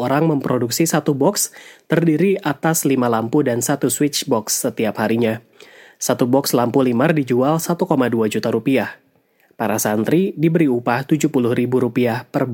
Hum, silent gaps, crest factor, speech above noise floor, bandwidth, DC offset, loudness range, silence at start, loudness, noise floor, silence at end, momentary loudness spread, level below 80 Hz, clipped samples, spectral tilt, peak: none; none; 16 dB; 41 dB; 17 kHz; under 0.1%; 1 LU; 0 s; -18 LUFS; -58 dBFS; 0 s; 5 LU; -64 dBFS; under 0.1%; -5 dB/octave; -2 dBFS